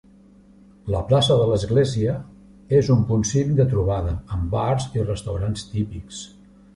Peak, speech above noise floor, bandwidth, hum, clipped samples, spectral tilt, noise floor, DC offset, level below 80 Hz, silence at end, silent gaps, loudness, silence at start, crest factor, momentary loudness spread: -4 dBFS; 30 dB; 11.5 kHz; none; under 0.1%; -6.5 dB/octave; -50 dBFS; under 0.1%; -36 dBFS; 0.5 s; none; -22 LUFS; 0.85 s; 18 dB; 13 LU